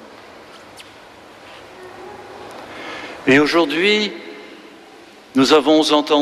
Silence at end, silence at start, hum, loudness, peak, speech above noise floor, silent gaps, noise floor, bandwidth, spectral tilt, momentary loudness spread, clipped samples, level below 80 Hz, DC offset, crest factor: 0 s; 0.05 s; none; -15 LUFS; -2 dBFS; 29 dB; none; -43 dBFS; 13.5 kHz; -4 dB/octave; 26 LU; under 0.1%; -58 dBFS; under 0.1%; 18 dB